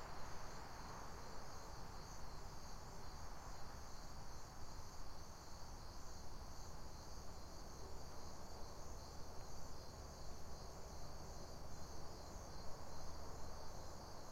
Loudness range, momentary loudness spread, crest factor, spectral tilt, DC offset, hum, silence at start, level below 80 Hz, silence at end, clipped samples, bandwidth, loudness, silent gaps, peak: 1 LU; 2 LU; 14 dB; -4 dB/octave; under 0.1%; none; 0 s; -56 dBFS; 0 s; under 0.1%; 16 kHz; -55 LUFS; none; -34 dBFS